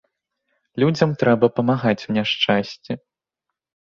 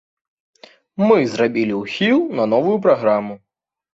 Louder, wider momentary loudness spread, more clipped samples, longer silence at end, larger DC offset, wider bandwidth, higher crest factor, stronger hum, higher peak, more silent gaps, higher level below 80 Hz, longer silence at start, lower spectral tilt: about the same, -19 LUFS vs -17 LUFS; first, 14 LU vs 6 LU; neither; first, 1 s vs 0.6 s; neither; about the same, 7.4 kHz vs 8 kHz; about the same, 20 dB vs 16 dB; neither; about the same, 0 dBFS vs -2 dBFS; neither; about the same, -58 dBFS vs -62 dBFS; second, 0.75 s vs 1 s; about the same, -6.5 dB/octave vs -6.5 dB/octave